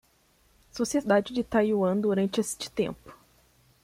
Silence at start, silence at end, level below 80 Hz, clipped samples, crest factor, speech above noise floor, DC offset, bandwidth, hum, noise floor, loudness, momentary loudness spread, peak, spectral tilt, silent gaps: 0.75 s; 0.7 s; -60 dBFS; under 0.1%; 18 dB; 38 dB; under 0.1%; 16 kHz; none; -65 dBFS; -27 LUFS; 8 LU; -10 dBFS; -5 dB/octave; none